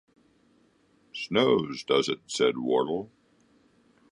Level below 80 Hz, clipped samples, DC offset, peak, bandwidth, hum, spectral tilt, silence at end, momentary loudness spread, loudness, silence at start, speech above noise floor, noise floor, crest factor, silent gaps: -68 dBFS; under 0.1%; under 0.1%; -10 dBFS; 11 kHz; none; -4.5 dB/octave; 1.05 s; 14 LU; -27 LUFS; 1.15 s; 39 dB; -65 dBFS; 20 dB; none